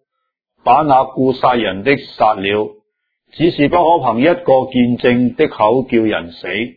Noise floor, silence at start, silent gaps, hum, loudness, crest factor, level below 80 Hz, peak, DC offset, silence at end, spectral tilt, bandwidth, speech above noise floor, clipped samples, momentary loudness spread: -75 dBFS; 0.65 s; none; none; -14 LUFS; 14 dB; -46 dBFS; 0 dBFS; under 0.1%; 0.05 s; -9 dB/octave; 5 kHz; 61 dB; under 0.1%; 7 LU